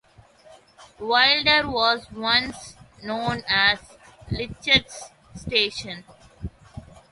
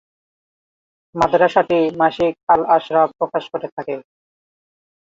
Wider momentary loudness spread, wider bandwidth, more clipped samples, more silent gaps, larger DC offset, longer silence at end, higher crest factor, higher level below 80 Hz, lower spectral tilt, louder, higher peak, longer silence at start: first, 22 LU vs 13 LU; first, 11.5 kHz vs 7.6 kHz; neither; second, none vs 2.43-2.47 s, 3.72-3.77 s; neither; second, 0.3 s vs 1.05 s; about the same, 22 dB vs 18 dB; first, -48 dBFS vs -54 dBFS; second, -3 dB/octave vs -6.5 dB/octave; second, -20 LUFS vs -17 LUFS; about the same, -2 dBFS vs -2 dBFS; second, 0.5 s vs 1.15 s